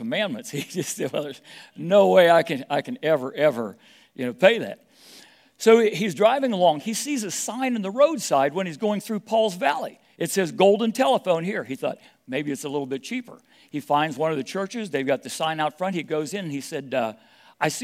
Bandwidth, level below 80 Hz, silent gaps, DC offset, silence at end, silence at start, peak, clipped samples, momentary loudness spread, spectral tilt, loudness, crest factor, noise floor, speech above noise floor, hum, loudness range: 16 kHz; -80 dBFS; none; under 0.1%; 0 s; 0 s; 0 dBFS; under 0.1%; 13 LU; -4.5 dB/octave; -23 LUFS; 22 dB; -51 dBFS; 28 dB; none; 6 LU